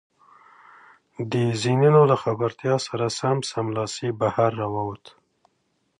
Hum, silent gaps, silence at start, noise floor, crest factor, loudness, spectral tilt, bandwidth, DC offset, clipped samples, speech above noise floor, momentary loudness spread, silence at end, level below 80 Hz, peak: none; none; 1.2 s; -71 dBFS; 18 dB; -23 LUFS; -6 dB/octave; 10.5 kHz; under 0.1%; under 0.1%; 49 dB; 11 LU; 1.05 s; -62 dBFS; -4 dBFS